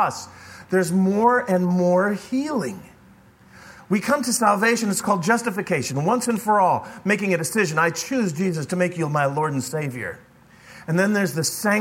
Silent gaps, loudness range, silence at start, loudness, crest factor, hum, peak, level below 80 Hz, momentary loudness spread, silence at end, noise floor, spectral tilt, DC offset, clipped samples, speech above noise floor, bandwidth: none; 3 LU; 0 s; -21 LUFS; 18 dB; none; -4 dBFS; -62 dBFS; 9 LU; 0 s; -51 dBFS; -5 dB/octave; under 0.1%; under 0.1%; 30 dB; 16.5 kHz